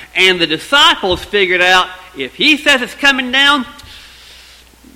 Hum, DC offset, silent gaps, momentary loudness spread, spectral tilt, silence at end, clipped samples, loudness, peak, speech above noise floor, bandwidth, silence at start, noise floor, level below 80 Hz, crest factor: none; under 0.1%; none; 10 LU; -2 dB/octave; 0.95 s; 0.2%; -11 LUFS; 0 dBFS; 29 dB; 17 kHz; 0 s; -41 dBFS; -42 dBFS; 14 dB